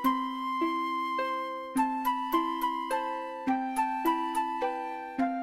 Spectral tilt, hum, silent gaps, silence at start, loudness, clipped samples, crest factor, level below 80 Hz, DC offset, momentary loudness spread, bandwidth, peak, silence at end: -3.5 dB/octave; none; none; 0 s; -31 LUFS; under 0.1%; 16 dB; -64 dBFS; under 0.1%; 4 LU; 16 kHz; -14 dBFS; 0 s